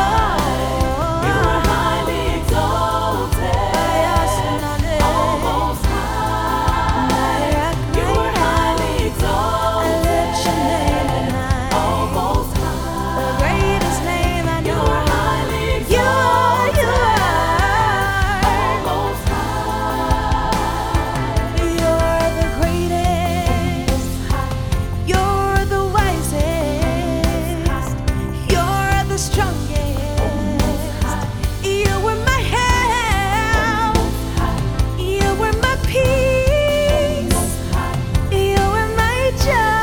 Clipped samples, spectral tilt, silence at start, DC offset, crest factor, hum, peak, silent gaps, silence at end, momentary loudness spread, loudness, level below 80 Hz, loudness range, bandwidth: under 0.1%; -5 dB/octave; 0 s; under 0.1%; 16 dB; none; -2 dBFS; none; 0 s; 5 LU; -18 LUFS; -24 dBFS; 3 LU; over 20 kHz